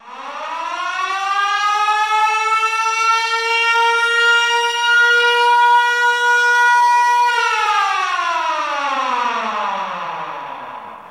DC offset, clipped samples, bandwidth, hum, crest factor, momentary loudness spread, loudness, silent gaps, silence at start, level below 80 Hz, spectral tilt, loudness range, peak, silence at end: under 0.1%; under 0.1%; 15.5 kHz; none; 12 dB; 13 LU; -15 LUFS; none; 0.05 s; -68 dBFS; 1 dB/octave; 6 LU; -4 dBFS; 0 s